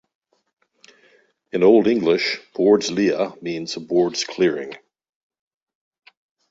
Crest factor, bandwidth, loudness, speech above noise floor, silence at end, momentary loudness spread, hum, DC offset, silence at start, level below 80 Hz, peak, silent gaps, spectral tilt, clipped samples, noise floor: 18 dB; 7.8 kHz; -19 LUFS; 39 dB; 1.75 s; 13 LU; none; under 0.1%; 1.55 s; -64 dBFS; -4 dBFS; none; -4.5 dB/octave; under 0.1%; -58 dBFS